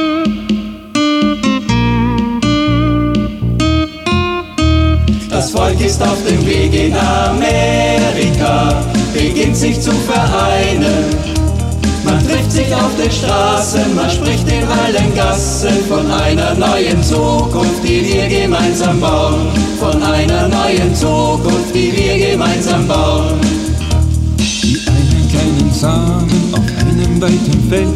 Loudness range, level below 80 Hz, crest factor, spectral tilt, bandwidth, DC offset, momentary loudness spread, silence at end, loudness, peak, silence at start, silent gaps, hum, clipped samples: 1 LU; -22 dBFS; 12 dB; -5.5 dB/octave; 15 kHz; under 0.1%; 3 LU; 0 s; -13 LUFS; 0 dBFS; 0 s; none; none; under 0.1%